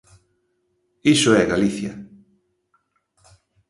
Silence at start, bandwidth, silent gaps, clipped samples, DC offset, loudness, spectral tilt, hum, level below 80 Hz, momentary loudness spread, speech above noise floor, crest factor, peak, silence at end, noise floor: 1.05 s; 11.5 kHz; none; under 0.1%; under 0.1%; -19 LUFS; -4.5 dB/octave; none; -54 dBFS; 17 LU; 52 dB; 20 dB; -2 dBFS; 1.65 s; -69 dBFS